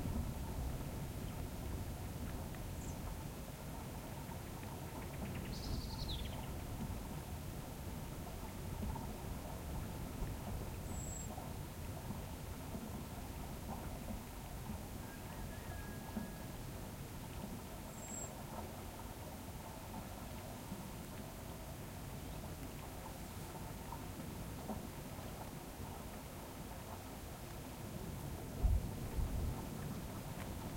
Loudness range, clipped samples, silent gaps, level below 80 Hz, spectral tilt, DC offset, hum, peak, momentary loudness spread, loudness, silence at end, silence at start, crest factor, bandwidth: 4 LU; under 0.1%; none; -50 dBFS; -5 dB/octave; under 0.1%; none; -24 dBFS; 5 LU; -47 LUFS; 0 s; 0 s; 22 dB; 16.5 kHz